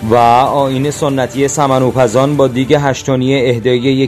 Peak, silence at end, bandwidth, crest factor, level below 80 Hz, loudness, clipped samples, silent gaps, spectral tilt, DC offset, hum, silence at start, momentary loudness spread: 0 dBFS; 0 s; 14 kHz; 12 dB; -42 dBFS; -12 LUFS; 0.2%; none; -5.5 dB/octave; under 0.1%; none; 0 s; 6 LU